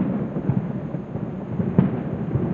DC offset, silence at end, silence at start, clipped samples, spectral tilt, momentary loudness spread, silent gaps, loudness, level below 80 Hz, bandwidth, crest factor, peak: under 0.1%; 0 s; 0 s; under 0.1%; -11.5 dB/octave; 9 LU; none; -25 LUFS; -48 dBFS; 3.9 kHz; 22 dB; -2 dBFS